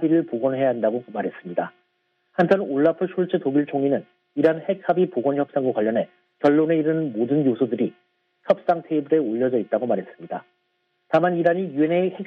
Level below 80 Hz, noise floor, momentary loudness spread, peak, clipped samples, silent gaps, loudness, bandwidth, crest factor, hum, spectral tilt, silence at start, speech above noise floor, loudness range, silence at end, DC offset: -72 dBFS; -71 dBFS; 9 LU; -4 dBFS; under 0.1%; none; -22 LUFS; 6 kHz; 18 dB; none; -9 dB/octave; 0 s; 50 dB; 2 LU; 0 s; under 0.1%